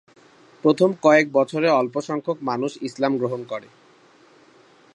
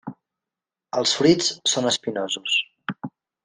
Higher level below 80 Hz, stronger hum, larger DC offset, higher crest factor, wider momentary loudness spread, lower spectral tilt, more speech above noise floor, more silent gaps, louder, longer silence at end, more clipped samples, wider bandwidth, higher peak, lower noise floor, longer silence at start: second, -76 dBFS vs -62 dBFS; neither; neither; about the same, 20 dB vs 20 dB; second, 12 LU vs 17 LU; first, -6 dB/octave vs -3 dB/octave; second, 33 dB vs 66 dB; neither; about the same, -21 LUFS vs -21 LUFS; first, 1.35 s vs 0.35 s; neither; about the same, 11 kHz vs 10 kHz; about the same, -2 dBFS vs -4 dBFS; second, -53 dBFS vs -88 dBFS; first, 0.65 s vs 0.05 s